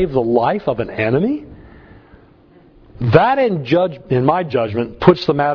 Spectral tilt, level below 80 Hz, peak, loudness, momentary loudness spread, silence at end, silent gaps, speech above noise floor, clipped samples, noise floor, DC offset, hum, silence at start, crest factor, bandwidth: -9 dB/octave; -44 dBFS; 0 dBFS; -16 LUFS; 8 LU; 0 s; none; 32 dB; under 0.1%; -47 dBFS; under 0.1%; none; 0 s; 16 dB; 5.4 kHz